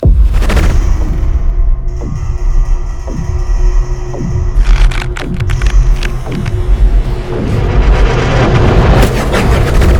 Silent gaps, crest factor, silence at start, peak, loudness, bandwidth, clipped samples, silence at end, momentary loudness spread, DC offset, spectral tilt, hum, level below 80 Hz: none; 8 dB; 0 s; 0 dBFS; -13 LUFS; 12.5 kHz; 0.3%; 0 s; 9 LU; under 0.1%; -6.5 dB/octave; none; -10 dBFS